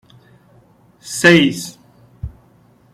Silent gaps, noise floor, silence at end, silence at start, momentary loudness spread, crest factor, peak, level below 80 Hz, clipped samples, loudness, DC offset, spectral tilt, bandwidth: none; -51 dBFS; 0.65 s; 1.05 s; 24 LU; 20 dB; 0 dBFS; -44 dBFS; under 0.1%; -13 LUFS; under 0.1%; -4.5 dB/octave; 15 kHz